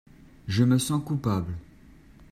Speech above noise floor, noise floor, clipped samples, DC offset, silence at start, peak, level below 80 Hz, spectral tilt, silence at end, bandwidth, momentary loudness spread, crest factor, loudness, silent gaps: 27 dB; -52 dBFS; under 0.1%; under 0.1%; 0.45 s; -10 dBFS; -52 dBFS; -6 dB/octave; 0.65 s; 15.5 kHz; 17 LU; 18 dB; -26 LUFS; none